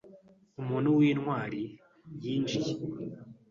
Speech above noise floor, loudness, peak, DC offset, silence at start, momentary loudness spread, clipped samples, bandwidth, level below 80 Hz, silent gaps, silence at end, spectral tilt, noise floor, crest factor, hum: 27 dB; -31 LUFS; -16 dBFS; under 0.1%; 0.05 s; 19 LU; under 0.1%; 7.2 kHz; -68 dBFS; none; 0.2 s; -7 dB/octave; -57 dBFS; 16 dB; none